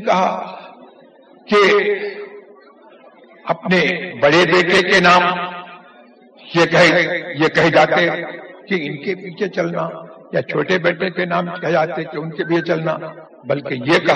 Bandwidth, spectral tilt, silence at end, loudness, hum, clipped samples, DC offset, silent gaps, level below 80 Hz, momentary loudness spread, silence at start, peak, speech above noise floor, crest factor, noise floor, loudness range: 9.4 kHz; -5 dB/octave; 0 s; -16 LUFS; none; under 0.1%; under 0.1%; none; -58 dBFS; 17 LU; 0 s; 0 dBFS; 30 dB; 18 dB; -46 dBFS; 6 LU